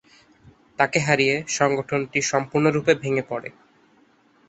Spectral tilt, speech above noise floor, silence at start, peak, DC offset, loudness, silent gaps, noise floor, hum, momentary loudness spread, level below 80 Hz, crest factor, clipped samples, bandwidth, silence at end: -4.5 dB/octave; 37 dB; 0.8 s; -2 dBFS; under 0.1%; -22 LUFS; none; -59 dBFS; none; 12 LU; -60 dBFS; 22 dB; under 0.1%; 8.2 kHz; 1 s